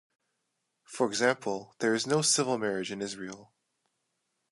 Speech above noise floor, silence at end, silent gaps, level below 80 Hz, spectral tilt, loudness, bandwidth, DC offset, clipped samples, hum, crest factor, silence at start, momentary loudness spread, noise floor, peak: 51 dB; 1.05 s; none; -76 dBFS; -3 dB/octave; -29 LUFS; 11.5 kHz; under 0.1%; under 0.1%; none; 22 dB; 0.9 s; 16 LU; -81 dBFS; -10 dBFS